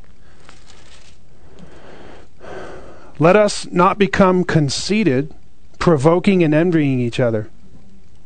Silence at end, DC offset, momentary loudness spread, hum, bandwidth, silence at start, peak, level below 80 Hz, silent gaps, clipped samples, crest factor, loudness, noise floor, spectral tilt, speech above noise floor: 0.8 s; 3%; 20 LU; none; 9.4 kHz; 1.9 s; 0 dBFS; -44 dBFS; none; under 0.1%; 18 dB; -16 LUFS; -47 dBFS; -6 dB/octave; 33 dB